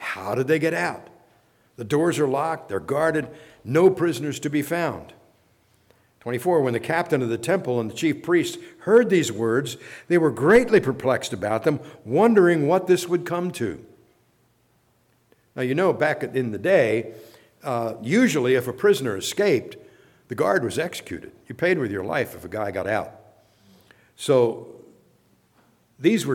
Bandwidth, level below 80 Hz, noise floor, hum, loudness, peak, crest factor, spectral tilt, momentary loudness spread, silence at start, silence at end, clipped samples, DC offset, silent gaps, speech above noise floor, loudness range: 17 kHz; -60 dBFS; -64 dBFS; none; -22 LUFS; -6 dBFS; 18 dB; -5.5 dB/octave; 14 LU; 0 s; 0 s; under 0.1%; under 0.1%; none; 42 dB; 7 LU